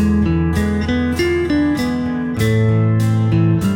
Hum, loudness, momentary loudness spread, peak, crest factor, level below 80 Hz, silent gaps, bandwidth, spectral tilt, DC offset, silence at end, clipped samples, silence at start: none; -16 LUFS; 4 LU; -4 dBFS; 12 dB; -30 dBFS; none; 16.5 kHz; -7.5 dB/octave; under 0.1%; 0 s; under 0.1%; 0 s